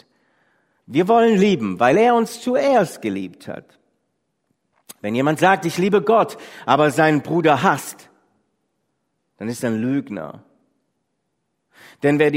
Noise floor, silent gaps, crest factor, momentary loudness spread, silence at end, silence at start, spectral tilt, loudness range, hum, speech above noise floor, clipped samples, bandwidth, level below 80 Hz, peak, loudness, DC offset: -74 dBFS; none; 20 dB; 17 LU; 0 s; 0.9 s; -6 dB/octave; 11 LU; none; 56 dB; under 0.1%; 16 kHz; -64 dBFS; 0 dBFS; -18 LUFS; under 0.1%